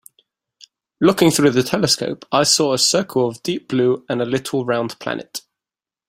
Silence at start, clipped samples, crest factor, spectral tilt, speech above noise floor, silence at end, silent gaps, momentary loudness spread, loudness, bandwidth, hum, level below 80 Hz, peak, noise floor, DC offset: 1 s; under 0.1%; 18 dB; -3.5 dB/octave; 72 dB; 0.7 s; none; 12 LU; -18 LUFS; 16 kHz; none; -58 dBFS; -2 dBFS; -90 dBFS; under 0.1%